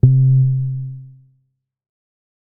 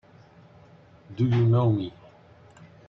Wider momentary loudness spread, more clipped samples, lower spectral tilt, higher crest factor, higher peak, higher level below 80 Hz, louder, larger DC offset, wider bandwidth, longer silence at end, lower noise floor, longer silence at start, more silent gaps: first, 20 LU vs 17 LU; neither; first, -17 dB/octave vs -10 dB/octave; about the same, 18 dB vs 16 dB; first, 0 dBFS vs -12 dBFS; first, -40 dBFS vs -60 dBFS; first, -16 LUFS vs -24 LUFS; neither; second, 0.8 kHz vs 5.4 kHz; first, 1.4 s vs 1 s; first, -67 dBFS vs -53 dBFS; second, 0.05 s vs 1.1 s; neither